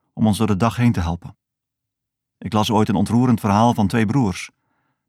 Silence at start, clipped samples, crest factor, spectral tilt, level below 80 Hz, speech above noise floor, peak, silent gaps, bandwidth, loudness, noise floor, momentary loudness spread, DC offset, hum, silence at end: 0.15 s; under 0.1%; 16 dB; -6.5 dB/octave; -44 dBFS; 64 dB; -4 dBFS; none; 15 kHz; -19 LUFS; -82 dBFS; 12 LU; under 0.1%; none; 0.6 s